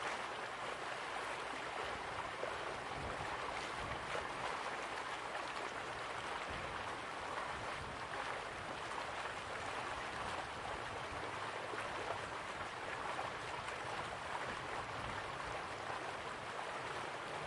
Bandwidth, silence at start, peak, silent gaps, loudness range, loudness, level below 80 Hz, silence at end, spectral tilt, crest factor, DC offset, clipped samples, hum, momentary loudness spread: 11.5 kHz; 0 s; -26 dBFS; none; 1 LU; -43 LUFS; -64 dBFS; 0 s; -3 dB/octave; 18 dB; under 0.1%; under 0.1%; none; 2 LU